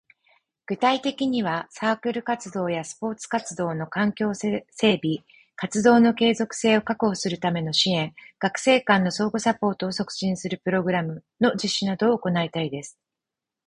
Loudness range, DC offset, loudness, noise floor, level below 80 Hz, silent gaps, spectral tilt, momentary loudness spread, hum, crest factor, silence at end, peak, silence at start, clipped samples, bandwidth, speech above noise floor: 5 LU; under 0.1%; -24 LUFS; -87 dBFS; -62 dBFS; none; -4.5 dB/octave; 9 LU; none; 20 dB; 0.8 s; -4 dBFS; 0.7 s; under 0.1%; 11 kHz; 64 dB